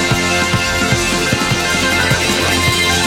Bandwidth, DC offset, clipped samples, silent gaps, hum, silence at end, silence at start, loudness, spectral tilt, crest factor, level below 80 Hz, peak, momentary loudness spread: 17 kHz; under 0.1%; under 0.1%; none; none; 0 s; 0 s; -13 LUFS; -3 dB/octave; 14 dB; -32 dBFS; 0 dBFS; 2 LU